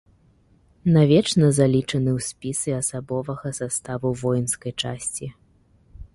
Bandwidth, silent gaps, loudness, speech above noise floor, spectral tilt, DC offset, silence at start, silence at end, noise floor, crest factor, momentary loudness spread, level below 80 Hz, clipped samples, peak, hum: 11.5 kHz; none; -22 LUFS; 36 dB; -5.5 dB/octave; under 0.1%; 0.85 s; 0.1 s; -58 dBFS; 18 dB; 12 LU; -50 dBFS; under 0.1%; -6 dBFS; none